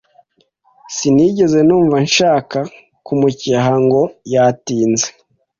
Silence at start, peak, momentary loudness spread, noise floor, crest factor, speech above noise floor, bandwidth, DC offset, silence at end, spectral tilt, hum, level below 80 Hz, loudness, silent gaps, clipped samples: 0.9 s; -2 dBFS; 10 LU; -58 dBFS; 14 dB; 45 dB; 7.6 kHz; under 0.1%; 0.5 s; -5 dB/octave; none; -52 dBFS; -14 LUFS; none; under 0.1%